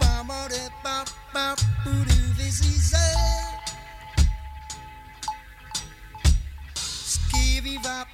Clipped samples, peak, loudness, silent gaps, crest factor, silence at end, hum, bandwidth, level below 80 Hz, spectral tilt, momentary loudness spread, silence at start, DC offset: under 0.1%; -8 dBFS; -25 LUFS; none; 16 dB; 0 s; none; 15.5 kHz; -26 dBFS; -3.5 dB/octave; 16 LU; 0 s; under 0.1%